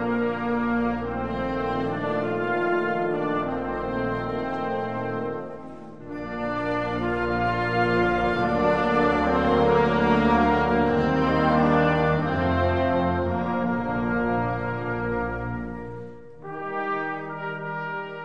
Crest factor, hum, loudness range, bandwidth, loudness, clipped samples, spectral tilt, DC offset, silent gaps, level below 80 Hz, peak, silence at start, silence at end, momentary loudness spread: 16 dB; none; 8 LU; 7.8 kHz; -24 LUFS; under 0.1%; -8 dB/octave; 0.5%; none; -42 dBFS; -8 dBFS; 0 s; 0 s; 11 LU